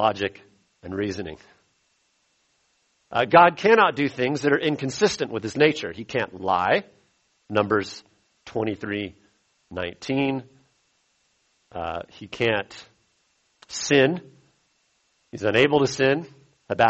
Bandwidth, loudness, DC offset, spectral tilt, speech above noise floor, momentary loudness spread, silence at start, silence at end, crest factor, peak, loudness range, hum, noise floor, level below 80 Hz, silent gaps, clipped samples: 8.2 kHz; -23 LUFS; under 0.1%; -4.5 dB/octave; 46 dB; 18 LU; 0 s; 0 s; 22 dB; -2 dBFS; 11 LU; none; -68 dBFS; -60 dBFS; none; under 0.1%